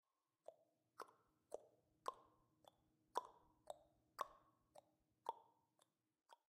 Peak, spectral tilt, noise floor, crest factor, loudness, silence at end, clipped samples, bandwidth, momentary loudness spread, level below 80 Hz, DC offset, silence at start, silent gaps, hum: -26 dBFS; -2.5 dB/octave; -84 dBFS; 34 dB; -56 LUFS; 0.2 s; under 0.1%; 15 kHz; 15 LU; under -90 dBFS; under 0.1%; 0.5 s; none; none